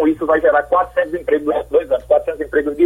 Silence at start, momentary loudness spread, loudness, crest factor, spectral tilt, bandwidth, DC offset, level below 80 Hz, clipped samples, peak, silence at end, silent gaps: 0 s; 5 LU; -17 LUFS; 12 dB; -7 dB/octave; 13 kHz; under 0.1%; -44 dBFS; under 0.1%; -4 dBFS; 0 s; none